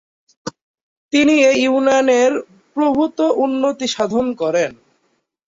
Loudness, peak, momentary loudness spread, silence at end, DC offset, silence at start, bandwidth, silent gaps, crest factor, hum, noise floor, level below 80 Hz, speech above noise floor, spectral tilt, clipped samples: -16 LUFS; -2 dBFS; 15 LU; 0.85 s; under 0.1%; 0.45 s; 7.8 kHz; 0.62-0.74 s, 0.81-1.09 s; 14 dB; none; -66 dBFS; -58 dBFS; 51 dB; -3.5 dB/octave; under 0.1%